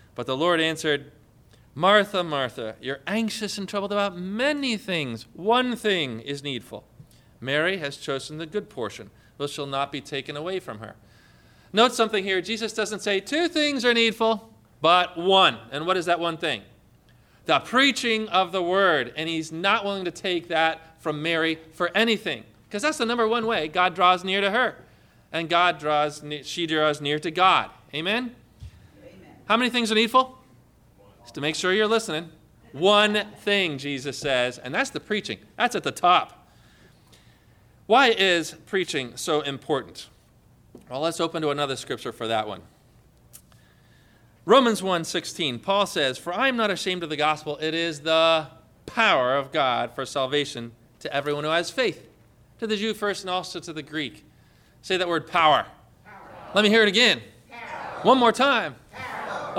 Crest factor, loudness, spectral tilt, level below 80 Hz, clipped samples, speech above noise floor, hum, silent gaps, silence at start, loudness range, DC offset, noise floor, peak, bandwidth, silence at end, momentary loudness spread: 18 dB; -23 LUFS; -3.5 dB/octave; -62 dBFS; under 0.1%; 33 dB; none; none; 0.2 s; 7 LU; under 0.1%; -57 dBFS; -6 dBFS; 16.5 kHz; 0 s; 14 LU